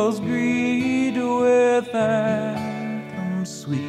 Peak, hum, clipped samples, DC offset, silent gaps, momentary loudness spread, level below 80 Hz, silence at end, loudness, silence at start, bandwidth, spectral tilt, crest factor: -8 dBFS; none; under 0.1%; under 0.1%; none; 10 LU; -66 dBFS; 0 s; -22 LUFS; 0 s; 13 kHz; -6 dB/octave; 14 dB